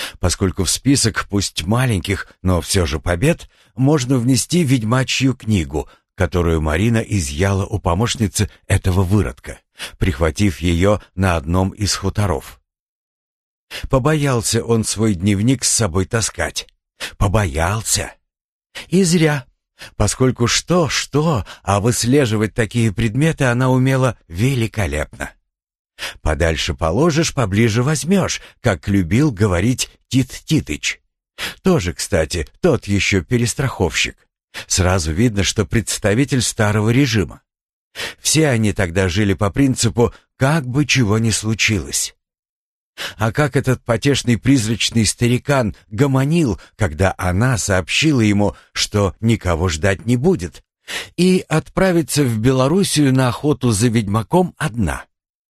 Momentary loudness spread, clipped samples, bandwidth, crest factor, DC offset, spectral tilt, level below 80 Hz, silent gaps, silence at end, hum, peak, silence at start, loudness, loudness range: 8 LU; under 0.1%; 13 kHz; 18 dB; under 0.1%; -5 dB/octave; -34 dBFS; 12.80-13.68 s, 18.41-18.60 s, 25.79-25.85 s, 34.44-34.48 s, 37.63-37.67 s, 37.73-37.91 s, 42.39-42.43 s, 42.49-42.94 s; 0.45 s; none; 0 dBFS; 0 s; -17 LUFS; 3 LU